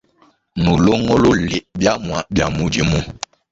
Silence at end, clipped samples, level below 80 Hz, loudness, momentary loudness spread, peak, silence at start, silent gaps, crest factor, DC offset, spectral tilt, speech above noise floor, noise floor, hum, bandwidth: 0.35 s; under 0.1%; -34 dBFS; -17 LUFS; 9 LU; -2 dBFS; 0.55 s; none; 16 dB; under 0.1%; -5.5 dB/octave; 40 dB; -56 dBFS; none; 8 kHz